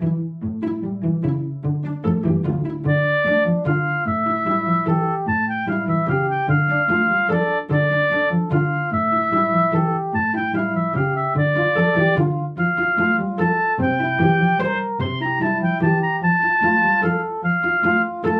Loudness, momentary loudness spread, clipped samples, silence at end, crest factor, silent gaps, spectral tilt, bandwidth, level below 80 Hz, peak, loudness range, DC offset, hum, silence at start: -20 LUFS; 6 LU; under 0.1%; 0 s; 14 dB; none; -10 dB/octave; 5 kHz; -54 dBFS; -4 dBFS; 2 LU; under 0.1%; none; 0 s